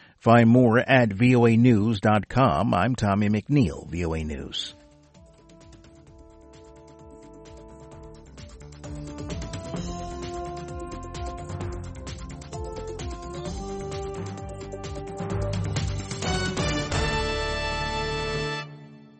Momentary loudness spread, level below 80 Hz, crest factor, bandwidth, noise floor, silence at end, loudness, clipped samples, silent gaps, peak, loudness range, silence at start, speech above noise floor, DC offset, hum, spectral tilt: 21 LU; -40 dBFS; 20 dB; 8.8 kHz; -53 dBFS; 0.2 s; -25 LUFS; under 0.1%; none; -6 dBFS; 19 LU; 0.25 s; 32 dB; under 0.1%; none; -6 dB/octave